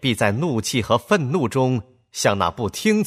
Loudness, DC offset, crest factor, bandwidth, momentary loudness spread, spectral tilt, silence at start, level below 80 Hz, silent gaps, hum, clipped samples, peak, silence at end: -21 LUFS; under 0.1%; 18 dB; 15.5 kHz; 4 LU; -5 dB/octave; 0 s; -52 dBFS; none; none; under 0.1%; -4 dBFS; 0 s